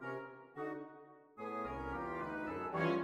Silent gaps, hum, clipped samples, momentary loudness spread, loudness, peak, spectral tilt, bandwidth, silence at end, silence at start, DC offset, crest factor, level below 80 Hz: none; none; under 0.1%; 14 LU; -42 LUFS; -24 dBFS; -7.5 dB/octave; 11.5 kHz; 0 s; 0 s; under 0.1%; 18 dB; -62 dBFS